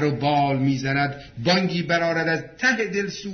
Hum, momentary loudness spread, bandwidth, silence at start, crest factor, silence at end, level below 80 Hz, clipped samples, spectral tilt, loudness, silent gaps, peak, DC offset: none; 5 LU; 6.6 kHz; 0 s; 16 dB; 0 s; -54 dBFS; under 0.1%; -5.5 dB/octave; -22 LUFS; none; -6 dBFS; under 0.1%